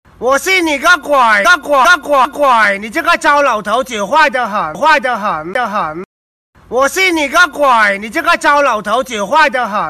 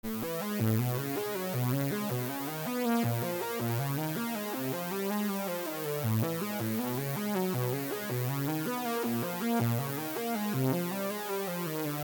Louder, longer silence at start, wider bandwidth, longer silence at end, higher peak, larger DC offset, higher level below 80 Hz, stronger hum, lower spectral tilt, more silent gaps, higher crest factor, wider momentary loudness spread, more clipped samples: first, -11 LUFS vs -32 LUFS; first, 0.2 s vs 0.05 s; second, 13.5 kHz vs over 20 kHz; about the same, 0 s vs 0 s; first, -2 dBFS vs -16 dBFS; neither; first, -46 dBFS vs -70 dBFS; neither; second, -2.5 dB/octave vs -5.5 dB/octave; first, 6.05-6.53 s vs none; second, 10 dB vs 16 dB; first, 7 LU vs 4 LU; neither